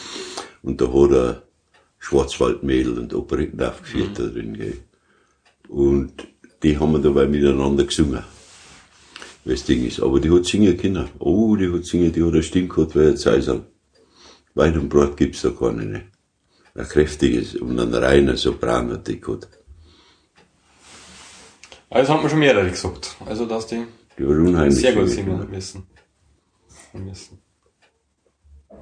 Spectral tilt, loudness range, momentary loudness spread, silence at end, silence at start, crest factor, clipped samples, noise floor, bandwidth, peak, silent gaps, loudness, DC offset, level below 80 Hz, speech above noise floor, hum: -6 dB/octave; 7 LU; 17 LU; 1.45 s; 0 s; 20 dB; under 0.1%; -67 dBFS; 10 kHz; -2 dBFS; none; -19 LUFS; under 0.1%; -36 dBFS; 48 dB; none